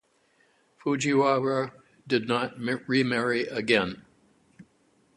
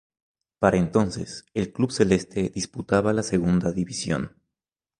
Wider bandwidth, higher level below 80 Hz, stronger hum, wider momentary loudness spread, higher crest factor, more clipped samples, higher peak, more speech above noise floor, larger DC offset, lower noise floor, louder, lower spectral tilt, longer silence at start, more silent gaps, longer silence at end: about the same, 11.5 kHz vs 11 kHz; second, -66 dBFS vs -48 dBFS; neither; about the same, 10 LU vs 8 LU; about the same, 22 dB vs 22 dB; neither; second, -6 dBFS vs -2 dBFS; second, 40 dB vs 65 dB; neither; second, -66 dBFS vs -88 dBFS; about the same, -26 LUFS vs -24 LUFS; about the same, -5 dB/octave vs -6 dB/octave; first, 0.85 s vs 0.6 s; neither; second, 0.55 s vs 0.7 s